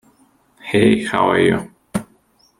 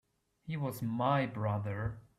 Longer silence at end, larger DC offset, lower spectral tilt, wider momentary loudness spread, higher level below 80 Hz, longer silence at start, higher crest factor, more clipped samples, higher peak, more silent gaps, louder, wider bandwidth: first, 0.55 s vs 0.15 s; neither; second, -6 dB/octave vs -7.5 dB/octave; first, 13 LU vs 9 LU; first, -50 dBFS vs -60 dBFS; first, 0.65 s vs 0.45 s; about the same, 18 dB vs 16 dB; neither; first, -2 dBFS vs -20 dBFS; neither; first, -17 LUFS vs -35 LUFS; second, 13 kHz vs 14.5 kHz